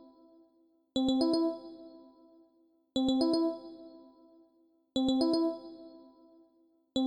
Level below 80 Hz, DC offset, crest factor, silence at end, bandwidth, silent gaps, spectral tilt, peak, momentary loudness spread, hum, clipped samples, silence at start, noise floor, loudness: -66 dBFS; under 0.1%; 16 dB; 0 s; 10 kHz; none; -5.5 dB/octave; -18 dBFS; 23 LU; none; under 0.1%; 0.95 s; -69 dBFS; -31 LUFS